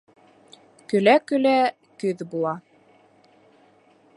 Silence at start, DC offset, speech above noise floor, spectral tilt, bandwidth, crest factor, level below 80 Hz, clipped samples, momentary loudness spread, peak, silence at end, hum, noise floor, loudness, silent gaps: 0.9 s; under 0.1%; 37 dB; -6 dB/octave; 11.5 kHz; 20 dB; -78 dBFS; under 0.1%; 11 LU; -4 dBFS; 1.55 s; none; -57 dBFS; -22 LUFS; none